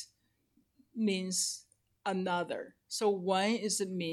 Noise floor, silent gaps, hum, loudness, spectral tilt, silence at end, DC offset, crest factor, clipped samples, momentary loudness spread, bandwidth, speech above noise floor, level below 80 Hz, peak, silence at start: -74 dBFS; none; none; -33 LUFS; -3.5 dB/octave; 0 s; under 0.1%; 18 dB; under 0.1%; 12 LU; 15.5 kHz; 41 dB; -84 dBFS; -18 dBFS; 0 s